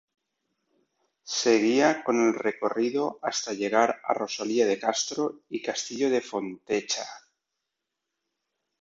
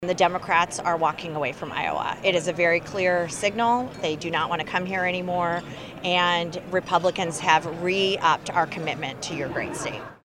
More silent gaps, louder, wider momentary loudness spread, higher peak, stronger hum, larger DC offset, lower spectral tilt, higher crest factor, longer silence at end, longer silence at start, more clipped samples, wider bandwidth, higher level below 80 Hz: neither; about the same, -26 LUFS vs -24 LUFS; about the same, 9 LU vs 8 LU; second, -8 dBFS vs -4 dBFS; neither; neither; about the same, -3 dB/octave vs -3.5 dB/octave; about the same, 20 dB vs 20 dB; first, 1.65 s vs 0.1 s; first, 1.25 s vs 0 s; neither; second, 7.8 kHz vs 15.5 kHz; second, -74 dBFS vs -58 dBFS